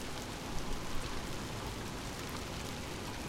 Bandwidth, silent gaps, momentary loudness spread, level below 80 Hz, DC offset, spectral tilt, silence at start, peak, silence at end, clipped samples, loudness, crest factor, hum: 16.5 kHz; none; 1 LU; -46 dBFS; under 0.1%; -4 dB/octave; 0 s; -24 dBFS; 0 s; under 0.1%; -41 LUFS; 16 dB; none